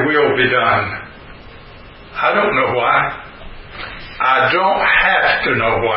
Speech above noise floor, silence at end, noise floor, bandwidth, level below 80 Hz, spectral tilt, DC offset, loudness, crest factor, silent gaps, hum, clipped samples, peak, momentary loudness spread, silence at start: 23 dB; 0 s; -38 dBFS; 5.8 kHz; -42 dBFS; -10 dB/octave; under 0.1%; -14 LUFS; 16 dB; none; none; under 0.1%; 0 dBFS; 18 LU; 0 s